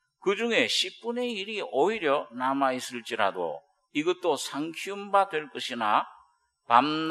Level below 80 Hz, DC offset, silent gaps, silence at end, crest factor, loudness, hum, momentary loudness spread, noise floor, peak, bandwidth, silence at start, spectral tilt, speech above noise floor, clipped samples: -80 dBFS; under 0.1%; none; 0 s; 24 dB; -27 LUFS; none; 10 LU; -64 dBFS; -4 dBFS; 13 kHz; 0.25 s; -3 dB/octave; 36 dB; under 0.1%